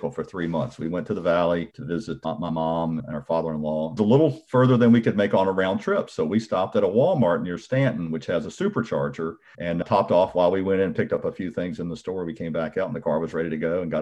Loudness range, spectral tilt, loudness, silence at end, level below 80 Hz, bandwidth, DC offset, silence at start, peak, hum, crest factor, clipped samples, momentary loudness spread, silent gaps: 5 LU; -8 dB/octave; -24 LUFS; 0 s; -56 dBFS; 8.8 kHz; under 0.1%; 0 s; -6 dBFS; none; 16 dB; under 0.1%; 11 LU; none